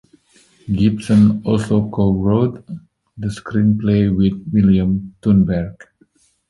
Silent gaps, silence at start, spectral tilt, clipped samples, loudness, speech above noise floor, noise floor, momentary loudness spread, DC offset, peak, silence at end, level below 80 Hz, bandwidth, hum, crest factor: none; 0.65 s; -8.5 dB/octave; under 0.1%; -17 LUFS; 41 dB; -57 dBFS; 13 LU; under 0.1%; -2 dBFS; 0.8 s; -38 dBFS; 11.5 kHz; none; 14 dB